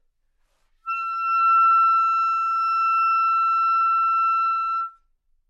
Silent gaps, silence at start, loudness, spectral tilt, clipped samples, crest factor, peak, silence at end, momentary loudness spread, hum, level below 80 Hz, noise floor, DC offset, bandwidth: none; 0.85 s; -19 LUFS; 3.5 dB/octave; under 0.1%; 10 dB; -12 dBFS; 0.6 s; 11 LU; none; -68 dBFS; -67 dBFS; under 0.1%; 7.2 kHz